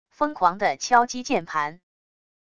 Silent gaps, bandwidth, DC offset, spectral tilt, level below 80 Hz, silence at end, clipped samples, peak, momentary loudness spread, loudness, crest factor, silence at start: none; 10 kHz; under 0.1%; -3 dB/octave; -60 dBFS; 0.8 s; under 0.1%; -4 dBFS; 8 LU; -23 LUFS; 20 dB; 0.2 s